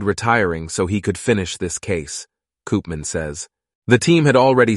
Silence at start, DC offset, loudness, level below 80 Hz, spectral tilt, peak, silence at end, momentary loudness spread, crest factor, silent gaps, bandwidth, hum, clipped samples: 0 s; under 0.1%; -18 LUFS; -44 dBFS; -5 dB/octave; -2 dBFS; 0 s; 17 LU; 16 dB; 3.75-3.82 s; 11.5 kHz; none; under 0.1%